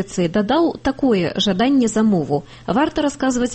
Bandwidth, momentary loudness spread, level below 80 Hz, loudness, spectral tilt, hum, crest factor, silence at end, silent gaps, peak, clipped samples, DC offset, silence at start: 8.8 kHz; 4 LU; -44 dBFS; -18 LUFS; -5 dB/octave; none; 12 dB; 0 s; none; -6 dBFS; under 0.1%; under 0.1%; 0 s